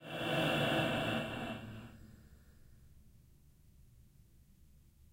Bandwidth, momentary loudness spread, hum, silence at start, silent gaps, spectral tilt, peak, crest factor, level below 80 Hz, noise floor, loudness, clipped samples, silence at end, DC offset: 16.5 kHz; 23 LU; none; 0 s; none; -5 dB/octave; -22 dBFS; 20 dB; -62 dBFS; -63 dBFS; -35 LUFS; under 0.1%; 0.35 s; under 0.1%